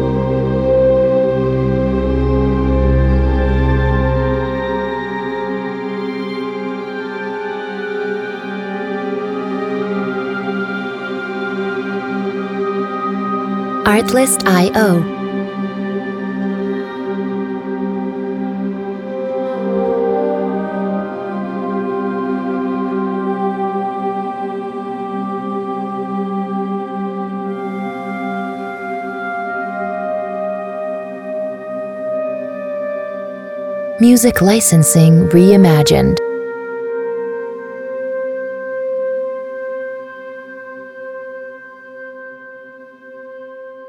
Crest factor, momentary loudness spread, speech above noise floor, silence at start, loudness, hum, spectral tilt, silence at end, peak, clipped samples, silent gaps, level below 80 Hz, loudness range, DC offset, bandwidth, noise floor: 16 dB; 13 LU; 28 dB; 0 s; -17 LUFS; none; -6 dB/octave; 0 s; 0 dBFS; under 0.1%; none; -28 dBFS; 11 LU; under 0.1%; 18.5 kHz; -37 dBFS